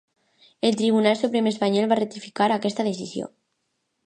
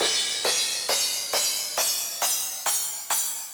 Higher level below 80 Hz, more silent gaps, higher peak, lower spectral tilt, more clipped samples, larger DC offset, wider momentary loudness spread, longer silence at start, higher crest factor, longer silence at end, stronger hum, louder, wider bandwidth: about the same, -74 dBFS vs -72 dBFS; neither; first, -6 dBFS vs -10 dBFS; first, -5.5 dB/octave vs 2 dB/octave; neither; neither; first, 11 LU vs 2 LU; first, 0.65 s vs 0 s; about the same, 18 dB vs 16 dB; first, 0.8 s vs 0 s; neither; about the same, -23 LUFS vs -23 LUFS; second, 9.6 kHz vs over 20 kHz